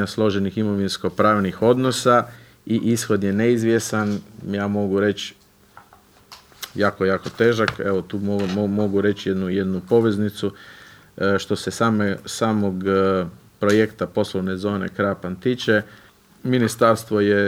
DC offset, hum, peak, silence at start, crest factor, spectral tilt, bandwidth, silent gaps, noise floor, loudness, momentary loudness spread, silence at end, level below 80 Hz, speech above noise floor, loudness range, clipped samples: under 0.1%; none; -2 dBFS; 0 s; 18 dB; -5.5 dB/octave; 16 kHz; none; -52 dBFS; -21 LUFS; 7 LU; 0 s; -58 dBFS; 32 dB; 4 LU; under 0.1%